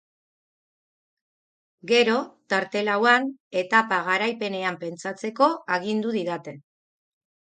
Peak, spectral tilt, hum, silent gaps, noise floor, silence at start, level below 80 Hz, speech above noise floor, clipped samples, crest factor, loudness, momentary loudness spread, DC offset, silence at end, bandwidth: -4 dBFS; -4 dB/octave; none; 3.40-3.51 s; under -90 dBFS; 1.85 s; -76 dBFS; over 66 dB; under 0.1%; 22 dB; -23 LUFS; 12 LU; under 0.1%; 0.9 s; 9.4 kHz